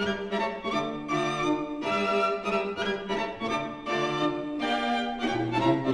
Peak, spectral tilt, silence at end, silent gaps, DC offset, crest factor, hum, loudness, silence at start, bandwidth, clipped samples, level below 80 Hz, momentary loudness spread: -12 dBFS; -5 dB/octave; 0 s; none; under 0.1%; 16 dB; none; -28 LUFS; 0 s; 11.5 kHz; under 0.1%; -56 dBFS; 5 LU